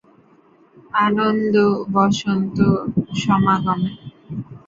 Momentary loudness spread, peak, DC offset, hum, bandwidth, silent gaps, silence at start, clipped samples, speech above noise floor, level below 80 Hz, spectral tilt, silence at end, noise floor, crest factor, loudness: 12 LU; -4 dBFS; under 0.1%; none; 7.6 kHz; none; 0.95 s; under 0.1%; 35 dB; -50 dBFS; -6.5 dB/octave; 0.1 s; -53 dBFS; 16 dB; -18 LUFS